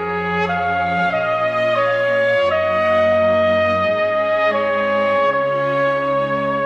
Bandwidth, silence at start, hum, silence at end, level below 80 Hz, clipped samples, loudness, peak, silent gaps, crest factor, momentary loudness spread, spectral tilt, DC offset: 7.8 kHz; 0 s; none; 0 s; -54 dBFS; under 0.1%; -17 LUFS; -4 dBFS; none; 12 dB; 4 LU; -6.5 dB/octave; under 0.1%